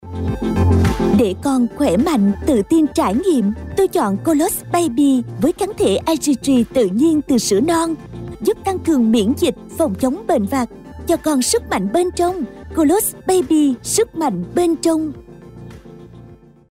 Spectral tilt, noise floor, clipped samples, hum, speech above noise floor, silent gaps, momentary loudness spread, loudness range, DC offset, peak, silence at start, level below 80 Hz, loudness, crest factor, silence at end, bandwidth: -5.5 dB/octave; -42 dBFS; under 0.1%; none; 26 dB; none; 7 LU; 2 LU; under 0.1%; -6 dBFS; 0.05 s; -36 dBFS; -17 LUFS; 10 dB; 0.35 s; 16 kHz